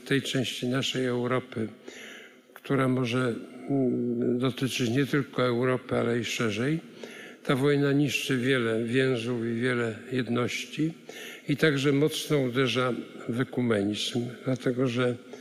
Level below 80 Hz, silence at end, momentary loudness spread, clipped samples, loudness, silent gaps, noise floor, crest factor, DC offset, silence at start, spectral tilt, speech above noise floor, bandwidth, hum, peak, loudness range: -72 dBFS; 0 s; 11 LU; under 0.1%; -28 LUFS; none; -50 dBFS; 18 dB; under 0.1%; 0 s; -5.5 dB/octave; 22 dB; 15.5 kHz; none; -10 dBFS; 3 LU